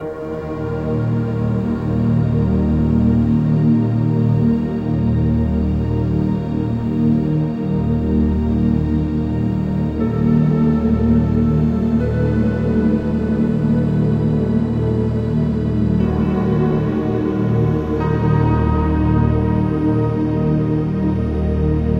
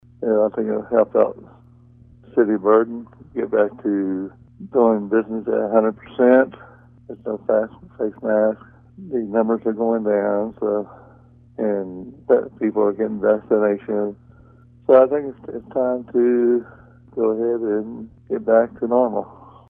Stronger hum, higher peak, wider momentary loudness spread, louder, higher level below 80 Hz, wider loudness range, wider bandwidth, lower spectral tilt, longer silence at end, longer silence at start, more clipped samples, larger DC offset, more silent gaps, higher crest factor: neither; about the same, -4 dBFS vs -2 dBFS; second, 4 LU vs 14 LU; about the same, -18 LUFS vs -20 LUFS; first, -28 dBFS vs -58 dBFS; about the same, 2 LU vs 3 LU; first, 5.6 kHz vs 3.6 kHz; about the same, -10.5 dB/octave vs -11 dB/octave; second, 0 s vs 0.35 s; second, 0 s vs 0.2 s; neither; neither; neither; second, 12 dB vs 20 dB